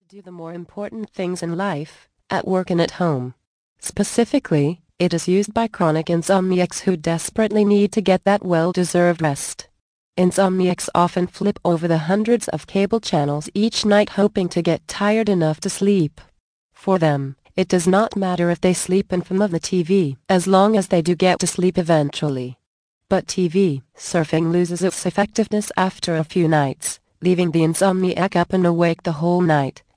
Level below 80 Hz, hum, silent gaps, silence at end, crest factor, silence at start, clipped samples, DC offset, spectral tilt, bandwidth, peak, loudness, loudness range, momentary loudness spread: -54 dBFS; none; 3.47-3.76 s, 9.80-10.13 s, 16.40-16.70 s, 22.66-23.01 s; 0.25 s; 18 dB; 0.15 s; under 0.1%; under 0.1%; -5.5 dB/octave; 10.5 kHz; -2 dBFS; -19 LUFS; 3 LU; 9 LU